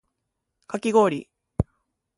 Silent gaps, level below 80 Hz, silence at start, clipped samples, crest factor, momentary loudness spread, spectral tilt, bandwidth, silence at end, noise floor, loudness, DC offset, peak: none; -44 dBFS; 0.7 s; under 0.1%; 20 dB; 14 LU; -6.5 dB/octave; 11.5 kHz; 0.55 s; -80 dBFS; -24 LUFS; under 0.1%; -6 dBFS